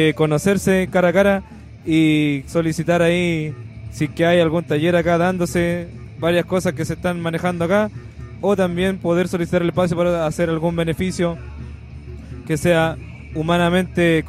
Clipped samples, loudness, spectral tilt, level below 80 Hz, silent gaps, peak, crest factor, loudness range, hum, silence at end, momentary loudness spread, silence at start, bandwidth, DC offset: under 0.1%; -19 LUFS; -6 dB/octave; -42 dBFS; none; -4 dBFS; 16 dB; 3 LU; none; 0 s; 17 LU; 0 s; 14.5 kHz; under 0.1%